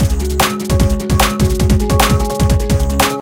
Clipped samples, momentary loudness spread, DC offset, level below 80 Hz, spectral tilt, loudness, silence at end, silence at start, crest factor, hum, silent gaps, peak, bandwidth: under 0.1%; 3 LU; 0.8%; -18 dBFS; -5 dB/octave; -14 LUFS; 0 s; 0 s; 12 dB; none; none; 0 dBFS; 17 kHz